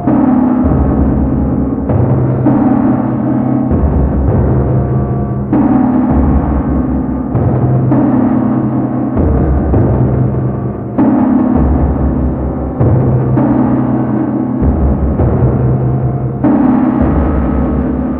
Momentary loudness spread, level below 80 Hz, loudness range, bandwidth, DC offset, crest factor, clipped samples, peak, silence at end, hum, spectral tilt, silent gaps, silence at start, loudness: 4 LU; -20 dBFS; 1 LU; 3 kHz; under 0.1%; 10 dB; under 0.1%; 0 dBFS; 0 s; none; -13.5 dB/octave; none; 0 s; -12 LUFS